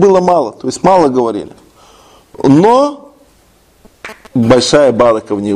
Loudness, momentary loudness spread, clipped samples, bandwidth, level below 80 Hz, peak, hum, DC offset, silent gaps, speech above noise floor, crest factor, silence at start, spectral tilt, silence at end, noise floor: -10 LUFS; 18 LU; 0.2%; 12 kHz; -42 dBFS; 0 dBFS; none; under 0.1%; none; 39 dB; 12 dB; 0 s; -5.5 dB/octave; 0 s; -48 dBFS